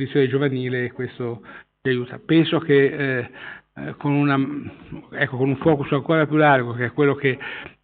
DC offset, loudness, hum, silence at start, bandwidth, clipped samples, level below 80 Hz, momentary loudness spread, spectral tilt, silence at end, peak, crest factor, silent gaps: under 0.1%; -21 LUFS; none; 0 s; 4.6 kHz; under 0.1%; -58 dBFS; 17 LU; -5.5 dB/octave; 0.15 s; -4 dBFS; 16 dB; none